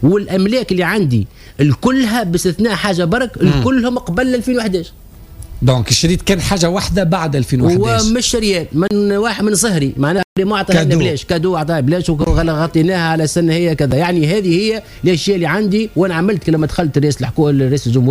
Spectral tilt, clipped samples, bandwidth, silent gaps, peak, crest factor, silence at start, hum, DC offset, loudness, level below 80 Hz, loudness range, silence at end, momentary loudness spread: -5.5 dB/octave; under 0.1%; 15.5 kHz; 10.24-10.36 s; 0 dBFS; 12 dB; 0 s; none; under 0.1%; -14 LUFS; -30 dBFS; 1 LU; 0 s; 3 LU